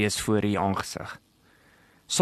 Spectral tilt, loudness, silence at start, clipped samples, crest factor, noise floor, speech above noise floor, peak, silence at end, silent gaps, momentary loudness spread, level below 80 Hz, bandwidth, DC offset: -4 dB/octave; -27 LUFS; 0 s; under 0.1%; 20 dB; -60 dBFS; 33 dB; -8 dBFS; 0 s; none; 16 LU; -56 dBFS; 13 kHz; under 0.1%